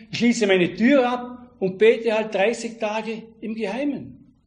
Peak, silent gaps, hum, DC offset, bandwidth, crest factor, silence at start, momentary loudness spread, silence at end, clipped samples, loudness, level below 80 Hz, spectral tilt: -4 dBFS; none; none; under 0.1%; 10 kHz; 18 dB; 0 s; 15 LU; 0.3 s; under 0.1%; -21 LUFS; -62 dBFS; -5 dB/octave